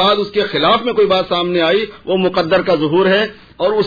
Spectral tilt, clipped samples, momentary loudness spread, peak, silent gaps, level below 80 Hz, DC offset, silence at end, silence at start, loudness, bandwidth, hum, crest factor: -6.5 dB/octave; under 0.1%; 5 LU; -4 dBFS; none; -48 dBFS; under 0.1%; 0 s; 0 s; -15 LUFS; 5 kHz; none; 12 dB